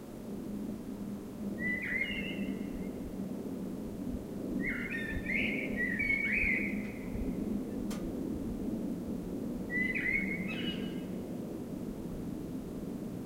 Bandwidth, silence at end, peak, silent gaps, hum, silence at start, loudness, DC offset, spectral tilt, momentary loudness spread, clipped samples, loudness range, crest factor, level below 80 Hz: 16 kHz; 0 s; -20 dBFS; none; none; 0 s; -36 LUFS; under 0.1%; -6 dB/octave; 11 LU; under 0.1%; 5 LU; 16 dB; -50 dBFS